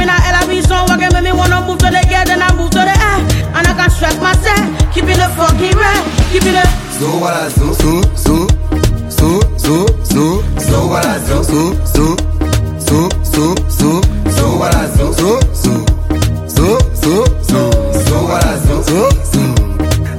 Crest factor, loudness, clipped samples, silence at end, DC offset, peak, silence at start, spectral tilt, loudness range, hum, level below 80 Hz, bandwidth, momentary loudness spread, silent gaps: 10 dB; -12 LUFS; under 0.1%; 0 s; under 0.1%; 0 dBFS; 0 s; -5 dB/octave; 2 LU; none; -16 dBFS; 17 kHz; 4 LU; none